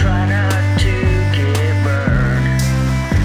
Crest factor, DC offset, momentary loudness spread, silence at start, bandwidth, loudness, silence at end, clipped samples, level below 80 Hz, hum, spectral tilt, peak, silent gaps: 10 dB; under 0.1%; 1 LU; 0 s; 14.5 kHz; -16 LUFS; 0 s; under 0.1%; -22 dBFS; none; -6 dB/octave; -4 dBFS; none